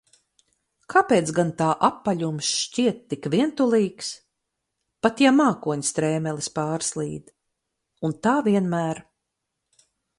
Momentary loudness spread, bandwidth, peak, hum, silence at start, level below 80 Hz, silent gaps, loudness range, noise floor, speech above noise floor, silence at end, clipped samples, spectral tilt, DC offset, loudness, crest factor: 12 LU; 11.5 kHz; -4 dBFS; none; 0.9 s; -64 dBFS; none; 4 LU; -81 dBFS; 58 dB; 1.15 s; under 0.1%; -4.5 dB/octave; under 0.1%; -23 LUFS; 20 dB